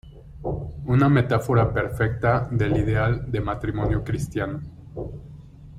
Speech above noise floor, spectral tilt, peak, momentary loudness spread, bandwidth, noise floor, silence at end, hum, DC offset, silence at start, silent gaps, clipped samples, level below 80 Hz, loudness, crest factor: 20 dB; -8 dB/octave; -6 dBFS; 16 LU; 13 kHz; -42 dBFS; 0 s; none; under 0.1%; 0.05 s; none; under 0.1%; -38 dBFS; -23 LUFS; 16 dB